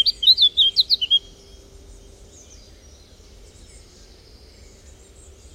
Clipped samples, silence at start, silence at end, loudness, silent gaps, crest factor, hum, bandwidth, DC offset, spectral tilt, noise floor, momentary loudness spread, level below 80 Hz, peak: under 0.1%; 0 s; 4.35 s; -15 LUFS; none; 20 dB; none; 15.5 kHz; under 0.1%; -1 dB/octave; -47 dBFS; 6 LU; -48 dBFS; -4 dBFS